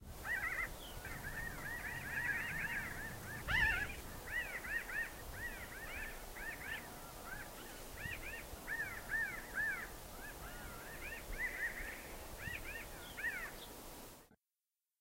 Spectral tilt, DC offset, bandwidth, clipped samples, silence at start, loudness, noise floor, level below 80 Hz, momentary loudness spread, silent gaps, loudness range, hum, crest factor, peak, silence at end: -3 dB/octave; under 0.1%; 16 kHz; under 0.1%; 0 s; -43 LUFS; under -90 dBFS; -54 dBFS; 11 LU; none; 7 LU; none; 22 dB; -22 dBFS; 0.65 s